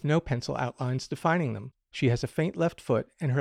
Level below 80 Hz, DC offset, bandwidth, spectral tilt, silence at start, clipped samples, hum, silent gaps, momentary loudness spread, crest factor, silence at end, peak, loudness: -54 dBFS; under 0.1%; 12.5 kHz; -7 dB/octave; 0.05 s; under 0.1%; none; none; 5 LU; 16 dB; 0 s; -14 dBFS; -29 LUFS